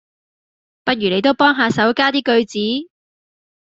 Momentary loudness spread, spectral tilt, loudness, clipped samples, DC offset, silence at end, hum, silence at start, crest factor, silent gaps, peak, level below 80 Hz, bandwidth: 8 LU; -5 dB/octave; -16 LUFS; under 0.1%; under 0.1%; 0.75 s; none; 0.85 s; 18 dB; none; -2 dBFS; -58 dBFS; 7.8 kHz